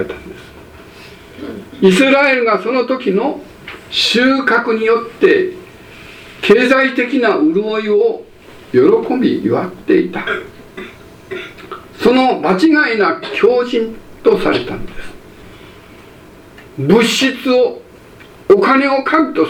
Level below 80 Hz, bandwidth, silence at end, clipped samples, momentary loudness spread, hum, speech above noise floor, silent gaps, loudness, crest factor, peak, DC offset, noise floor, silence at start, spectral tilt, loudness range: -44 dBFS; 16 kHz; 0 s; under 0.1%; 21 LU; none; 26 dB; none; -13 LUFS; 14 dB; 0 dBFS; under 0.1%; -39 dBFS; 0 s; -5 dB/octave; 4 LU